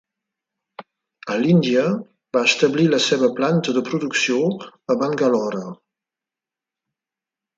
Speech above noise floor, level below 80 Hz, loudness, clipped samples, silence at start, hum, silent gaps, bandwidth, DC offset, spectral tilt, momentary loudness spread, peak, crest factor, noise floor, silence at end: 70 dB; -68 dBFS; -19 LUFS; under 0.1%; 0.8 s; none; none; 9 kHz; under 0.1%; -5 dB/octave; 11 LU; -4 dBFS; 18 dB; -88 dBFS; 1.85 s